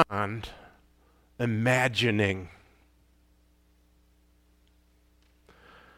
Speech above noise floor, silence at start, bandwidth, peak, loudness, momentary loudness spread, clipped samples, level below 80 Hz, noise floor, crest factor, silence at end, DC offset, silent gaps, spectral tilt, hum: 37 dB; 0 s; 16 kHz; -6 dBFS; -27 LUFS; 17 LU; under 0.1%; -60 dBFS; -64 dBFS; 26 dB; 3.45 s; under 0.1%; none; -5.5 dB/octave; none